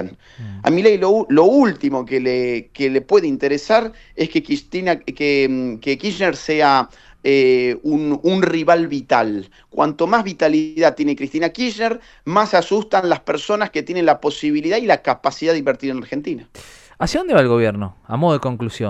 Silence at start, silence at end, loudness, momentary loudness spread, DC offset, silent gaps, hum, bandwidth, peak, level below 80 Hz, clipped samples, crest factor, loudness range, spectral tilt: 0 s; 0 s; -17 LUFS; 10 LU; under 0.1%; none; none; 10 kHz; 0 dBFS; -48 dBFS; under 0.1%; 18 dB; 3 LU; -6 dB/octave